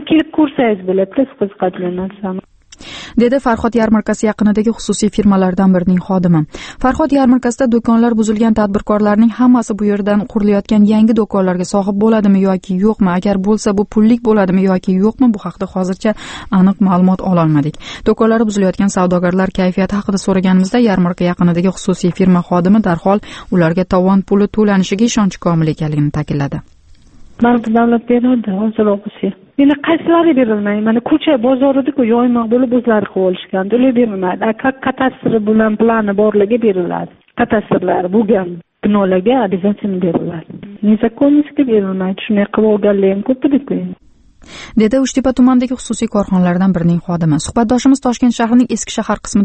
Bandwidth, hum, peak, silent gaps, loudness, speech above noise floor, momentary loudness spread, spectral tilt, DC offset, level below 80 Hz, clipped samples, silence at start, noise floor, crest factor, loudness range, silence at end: 8.8 kHz; none; 0 dBFS; none; -13 LUFS; 28 dB; 7 LU; -7 dB/octave; under 0.1%; -40 dBFS; under 0.1%; 0 s; -40 dBFS; 12 dB; 3 LU; 0 s